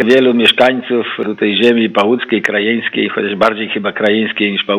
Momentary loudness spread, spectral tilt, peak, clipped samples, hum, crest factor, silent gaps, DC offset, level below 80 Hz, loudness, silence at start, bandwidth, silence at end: 7 LU; -5.5 dB/octave; 0 dBFS; 0.2%; none; 12 dB; none; under 0.1%; -56 dBFS; -13 LUFS; 0 s; 15 kHz; 0 s